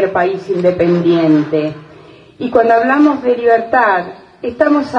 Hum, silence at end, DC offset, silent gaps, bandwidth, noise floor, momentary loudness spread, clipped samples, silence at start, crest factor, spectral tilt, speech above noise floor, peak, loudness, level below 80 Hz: none; 0 s; under 0.1%; none; 7 kHz; -39 dBFS; 13 LU; under 0.1%; 0 s; 12 dB; -8 dB/octave; 27 dB; 0 dBFS; -13 LUFS; -50 dBFS